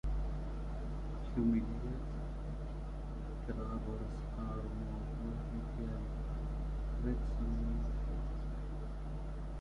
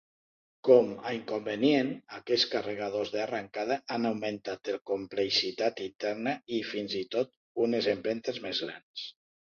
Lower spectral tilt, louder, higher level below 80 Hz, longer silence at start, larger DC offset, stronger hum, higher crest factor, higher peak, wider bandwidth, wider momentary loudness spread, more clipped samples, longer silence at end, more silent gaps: first, -9 dB/octave vs -4.5 dB/octave; second, -41 LUFS vs -30 LUFS; first, -40 dBFS vs -72 dBFS; second, 0.05 s vs 0.65 s; neither; first, 50 Hz at -40 dBFS vs none; second, 16 dB vs 22 dB; second, -22 dBFS vs -8 dBFS; about the same, 6.8 kHz vs 7.2 kHz; second, 7 LU vs 10 LU; neither; second, 0 s vs 0.45 s; second, none vs 4.81-4.85 s, 7.37-7.55 s, 8.83-8.94 s